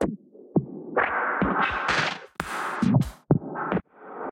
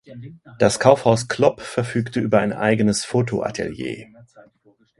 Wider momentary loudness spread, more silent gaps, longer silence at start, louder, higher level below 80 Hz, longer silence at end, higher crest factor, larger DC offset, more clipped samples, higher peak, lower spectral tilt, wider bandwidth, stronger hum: second, 9 LU vs 15 LU; neither; about the same, 0 s vs 0.1 s; second, -26 LUFS vs -20 LUFS; about the same, -48 dBFS vs -52 dBFS; second, 0 s vs 0.95 s; about the same, 20 dB vs 20 dB; neither; neither; second, -6 dBFS vs 0 dBFS; about the same, -6 dB/octave vs -5.5 dB/octave; first, 16 kHz vs 11.5 kHz; neither